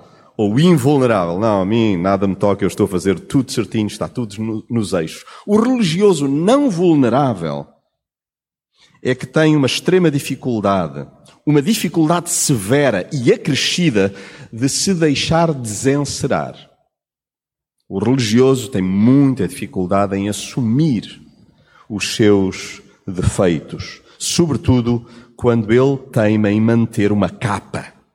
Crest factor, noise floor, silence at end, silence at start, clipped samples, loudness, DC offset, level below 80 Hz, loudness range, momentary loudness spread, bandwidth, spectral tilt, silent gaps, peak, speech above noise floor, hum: 16 dB; under -90 dBFS; 0.25 s; 0.4 s; under 0.1%; -16 LUFS; under 0.1%; -44 dBFS; 3 LU; 11 LU; 16.5 kHz; -5.5 dB/octave; none; -2 dBFS; over 74 dB; none